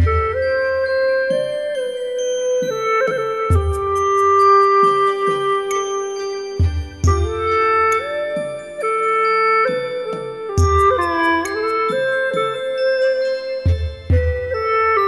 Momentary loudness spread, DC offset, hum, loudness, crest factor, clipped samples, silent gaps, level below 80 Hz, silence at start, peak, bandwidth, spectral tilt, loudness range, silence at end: 9 LU; 0.1%; none; -18 LUFS; 14 dB; under 0.1%; none; -30 dBFS; 0 s; -4 dBFS; 12.5 kHz; -5.5 dB/octave; 4 LU; 0 s